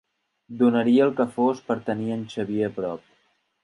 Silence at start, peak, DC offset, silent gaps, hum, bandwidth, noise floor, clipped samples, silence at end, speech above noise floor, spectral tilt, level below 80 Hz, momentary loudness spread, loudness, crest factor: 0.5 s; -8 dBFS; under 0.1%; none; none; 11 kHz; -67 dBFS; under 0.1%; 0.65 s; 44 dB; -7.5 dB/octave; -66 dBFS; 12 LU; -24 LUFS; 16 dB